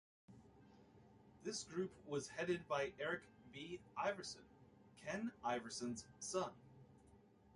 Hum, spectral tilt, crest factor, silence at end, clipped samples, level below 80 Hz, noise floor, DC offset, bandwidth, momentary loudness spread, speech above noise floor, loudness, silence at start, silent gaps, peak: none; -4 dB/octave; 20 dB; 0.35 s; under 0.1%; -76 dBFS; -68 dBFS; under 0.1%; 11.5 kHz; 23 LU; 23 dB; -46 LUFS; 0.3 s; none; -28 dBFS